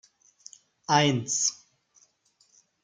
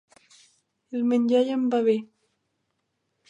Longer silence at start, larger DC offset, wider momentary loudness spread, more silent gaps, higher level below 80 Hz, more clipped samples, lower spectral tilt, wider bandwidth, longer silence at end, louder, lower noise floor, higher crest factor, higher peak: about the same, 0.9 s vs 0.9 s; neither; first, 20 LU vs 7 LU; neither; first, -72 dBFS vs -84 dBFS; neither; second, -3 dB/octave vs -6.5 dB/octave; first, 10.5 kHz vs 8.6 kHz; about the same, 1.3 s vs 1.25 s; about the same, -25 LUFS vs -24 LUFS; second, -67 dBFS vs -77 dBFS; first, 24 dB vs 16 dB; first, -6 dBFS vs -10 dBFS